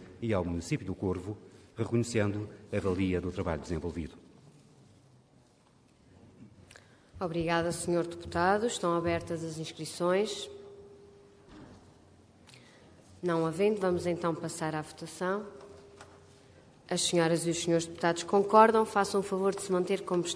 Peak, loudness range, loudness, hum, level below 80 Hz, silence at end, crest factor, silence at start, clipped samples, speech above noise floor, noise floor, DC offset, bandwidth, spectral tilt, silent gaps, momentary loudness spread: -8 dBFS; 12 LU; -31 LUFS; none; -58 dBFS; 0 s; 24 dB; 0 s; under 0.1%; 33 dB; -63 dBFS; under 0.1%; 11 kHz; -5 dB/octave; none; 12 LU